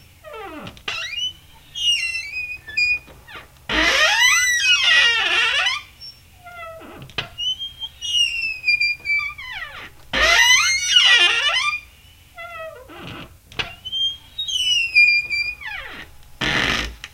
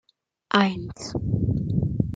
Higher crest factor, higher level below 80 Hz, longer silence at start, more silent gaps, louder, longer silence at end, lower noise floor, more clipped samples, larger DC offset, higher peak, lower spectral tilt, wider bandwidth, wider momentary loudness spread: about the same, 20 dB vs 22 dB; about the same, -44 dBFS vs -42 dBFS; second, 0.25 s vs 0.55 s; neither; first, -17 LUFS vs -25 LUFS; about the same, 0.05 s vs 0 s; first, -48 dBFS vs -44 dBFS; neither; neither; about the same, -2 dBFS vs -2 dBFS; second, 0 dB/octave vs -6.5 dB/octave; first, 16 kHz vs 9.2 kHz; first, 23 LU vs 10 LU